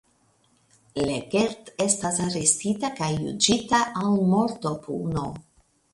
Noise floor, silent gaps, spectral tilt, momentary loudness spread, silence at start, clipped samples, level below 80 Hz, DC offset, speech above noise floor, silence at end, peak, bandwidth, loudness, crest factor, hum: -64 dBFS; none; -4 dB/octave; 9 LU; 0.95 s; under 0.1%; -54 dBFS; under 0.1%; 40 dB; 0.55 s; -2 dBFS; 11.5 kHz; -24 LUFS; 24 dB; none